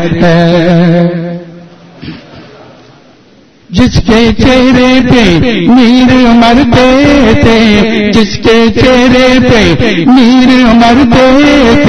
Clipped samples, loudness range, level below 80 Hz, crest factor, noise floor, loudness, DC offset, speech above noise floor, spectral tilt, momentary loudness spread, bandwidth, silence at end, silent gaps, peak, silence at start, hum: 5%; 8 LU; -24 dBFS; 6 dB; -40 dBFS; -5 LUFS; under 0.1%; 36 dB; -6 dB/octave; 5 LU; 9.6 kHz; 0 s; none; 0 dBFS; 0 s; none